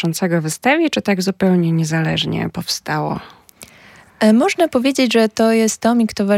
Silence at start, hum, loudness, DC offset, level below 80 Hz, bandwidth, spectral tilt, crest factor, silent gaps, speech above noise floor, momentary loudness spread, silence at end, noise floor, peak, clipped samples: 0 s; none; -16 LUFS; under 0.1%; -54 dBFS; 16.5 kHz; -5 dB/octave; 14 dB; none; 29 dB; 7 LU; 0 s; -45 dBFS; -2 dBFS; under 0.1%